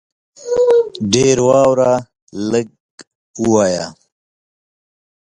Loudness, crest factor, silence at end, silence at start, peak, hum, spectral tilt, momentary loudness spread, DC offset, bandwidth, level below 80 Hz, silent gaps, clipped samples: -15 LUFS; 16 dB; 1.3 s; 0.4 s; 0 dBFS; none; -5 dB/octave; 16 LU; under 0.1%; 11 kHz; -50 dBFS; 2.22-2.27 s, 2.80-2.98 s, 3.07-3.34 s; under 0.1%